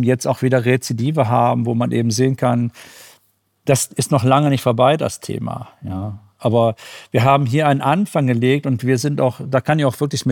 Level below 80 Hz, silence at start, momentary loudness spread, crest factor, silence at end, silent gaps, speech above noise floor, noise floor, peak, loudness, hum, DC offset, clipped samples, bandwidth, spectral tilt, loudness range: -60 dBFS; 0 s; 11 LU; 16 dB; 0 s; none; 44 dB; -61 dBFS; -2 dBFS; -17 LUFS; none; under 0.1%; under 0.1%; 18.5 kHz; -6 dB/octave; 2 LU